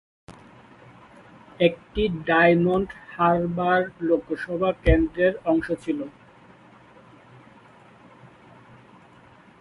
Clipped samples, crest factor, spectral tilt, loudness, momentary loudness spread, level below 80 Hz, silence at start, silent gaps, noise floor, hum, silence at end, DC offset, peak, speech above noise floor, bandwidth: under 0.1%; 22 dB; -8 dB/octave; -23 LUFS; 10 LU; -38 dBFS; 0.3 s; none; -52 dBFS; none; 3.5 s; under 0.1%; -4 dBFS; 29 dB; 11 kHz